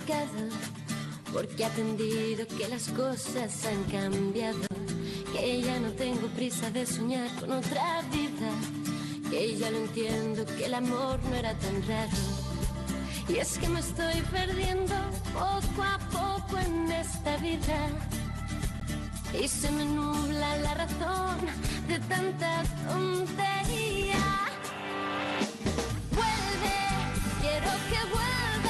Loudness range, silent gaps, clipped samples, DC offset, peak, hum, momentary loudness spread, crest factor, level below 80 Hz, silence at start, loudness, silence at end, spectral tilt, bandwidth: 2 LU; none; under 0.1%; under 0.1%; -18 dBFS; none; 6 LU; 12 dB; -42 dBFS; 0 s; -31 LUFS; 0 s; -4.5 dB/octave; 12.5 kHz